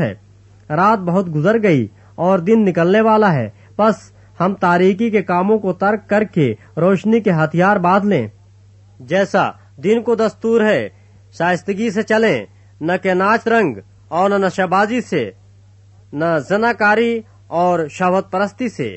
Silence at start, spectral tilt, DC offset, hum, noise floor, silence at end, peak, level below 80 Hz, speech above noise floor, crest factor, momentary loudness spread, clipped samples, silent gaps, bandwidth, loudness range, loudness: 0 s; -7 dB/octave; under 0.1%; none; -46 dBFS; 0 s; -2 dBFS; -58 dBFS; 31 dB; 14 dB; 9 LU; under 0.1%; none; 8.4 kHz; 3 LU; -16 LUFS